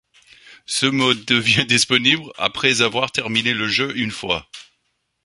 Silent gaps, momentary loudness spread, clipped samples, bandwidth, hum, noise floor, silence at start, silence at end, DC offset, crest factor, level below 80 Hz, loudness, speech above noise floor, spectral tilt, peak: none; 9 LU; under 0.1%; 11.5 kHz; none; -71 dBFS; 0.5 s; 0.6 s; under 0.1%; 20 dB; -54 dBFS; -18 LUFS; 51 dB; -3 dB/octave; 0 dBFS